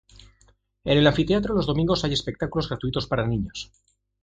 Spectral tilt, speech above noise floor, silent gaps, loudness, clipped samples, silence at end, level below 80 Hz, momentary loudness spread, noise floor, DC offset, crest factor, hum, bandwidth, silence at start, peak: -6 dB/octave; 38 dB; none; -24 LUFS; under 0.1%; 0.6 s; -42 dBFS; 14 LU; -61 dBFS; under 0.1%; 22 dB; none; 9.2 kHz; 0.85 s; -4 dBFS